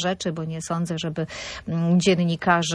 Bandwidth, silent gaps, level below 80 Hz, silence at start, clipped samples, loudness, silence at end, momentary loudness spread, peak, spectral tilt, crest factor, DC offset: 10.5 kHz; none; -54 dBFS; 0 s; under 0.1%; -24 LUFS; 0 s; 11 LU; -6 dBFS; -5 dB/octave; 16 dB; under 0.1%